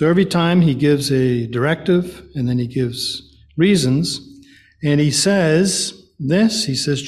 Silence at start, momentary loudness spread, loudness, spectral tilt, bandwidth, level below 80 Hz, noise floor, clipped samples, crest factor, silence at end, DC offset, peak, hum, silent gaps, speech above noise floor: 0 s; 10 LU; -17 LUFS; -5 dB/octave; 14.5 kHz; -48 dBFS; -46 dBFS; under 0.1%; 14 dB; 0 s; under 0.1%; -2 dBFS; none; none; 29 dB